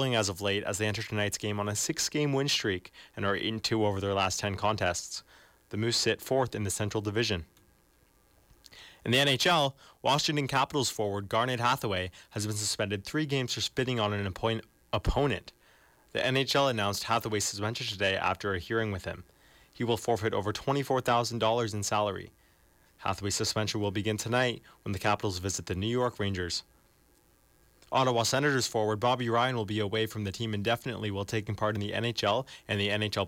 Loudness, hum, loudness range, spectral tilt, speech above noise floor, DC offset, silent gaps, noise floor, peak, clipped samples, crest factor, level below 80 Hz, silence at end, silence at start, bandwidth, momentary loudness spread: -30 LUFS; none; 3 LU; -4 dB/octave; 35 dB; under 0.1%; none; -65 dBFS; -14 dBFS; under 0.1%; 16 dB; -52 dBFS; 0 s; 0 s; 17 kHz; 8 LU